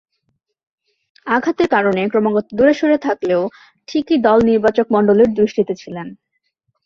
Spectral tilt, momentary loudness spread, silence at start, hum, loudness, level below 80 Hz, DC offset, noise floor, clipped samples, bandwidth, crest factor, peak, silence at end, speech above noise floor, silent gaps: -7 dB/octave; 14 LU; 1.25 s; none; -16 LUFS; -52 dBFS; under 0.1%; -70 dBFS; under 0.1%; 7.2 kHz; 14 dB; -2 dBFS; 0.7 s; 55 dB; none